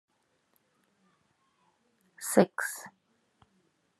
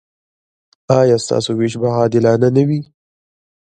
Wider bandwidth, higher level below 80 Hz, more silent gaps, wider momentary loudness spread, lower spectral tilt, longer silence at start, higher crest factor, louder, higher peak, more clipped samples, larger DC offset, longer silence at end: first, 13 kHz vs 9.4 kHz; second, -90 dBFS vs -56 dBFS; neither; first, 18 LU vs 6 LU; second, -5 dB/octave vs -6.5 dB/octave; first, 2.2 s vs 0.9 s; first, 28 dB vs 16 dB; second, -29 LUFS vs -15 LUFS; second, -6 dBFS vs 0 dBFS; neither; neither; first, 1.1 s vs 0.85 s